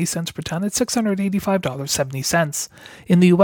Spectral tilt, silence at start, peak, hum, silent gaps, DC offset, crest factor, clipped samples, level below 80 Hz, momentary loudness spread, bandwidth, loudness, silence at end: -5 dB/octave; 0 s; -2 dBFS; none; none; under 0.1%; 18 dB; under 0.1%; -52 dBFS; 9 LU; 18.5 kHz; -21 LUFS; 0 s